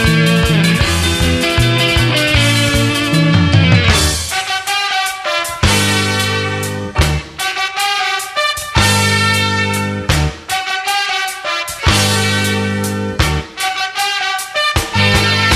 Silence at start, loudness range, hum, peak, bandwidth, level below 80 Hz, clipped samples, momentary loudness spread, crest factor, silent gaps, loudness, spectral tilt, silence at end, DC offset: 0 s; 3 LU; none; 0 dBFS; 14 kHz; -26 dBFS; under 0.1%; 7 LU; 14 dB; none; -13 LUFS; -4 dB/octave; 0 s; under 0.1%